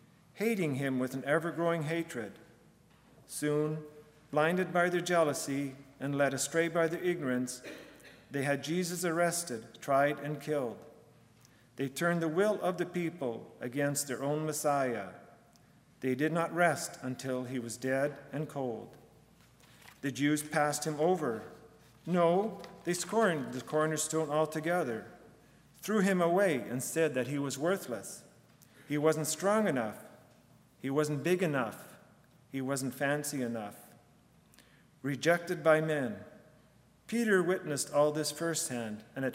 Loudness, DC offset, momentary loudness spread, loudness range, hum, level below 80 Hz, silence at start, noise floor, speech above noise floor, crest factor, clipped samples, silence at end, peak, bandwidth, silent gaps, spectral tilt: -32 LUFS; under 0.1%; 12 LU; 4 LU; none; -74 dBFS; 0.35 s; -63 dBFS; 31 dB; 22 dB; under 0.1%; 0 s; -12 dBFS; 16 kHz; none; -5 dB/octave